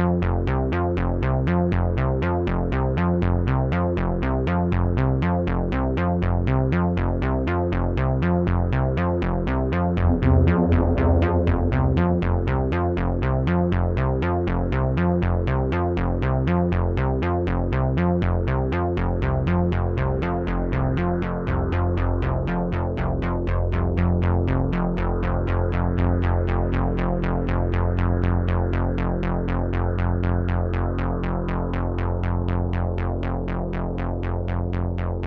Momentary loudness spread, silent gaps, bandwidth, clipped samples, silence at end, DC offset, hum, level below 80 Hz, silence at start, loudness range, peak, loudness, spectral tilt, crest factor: 4 LU; none; 4.9 kHz; under 0.1%; 0 s; under 0.1%; none; -28 dBFS; 0 s; 4 LU; -6 dBFS; -23 LUFS; -10 dB/octave; 16 dB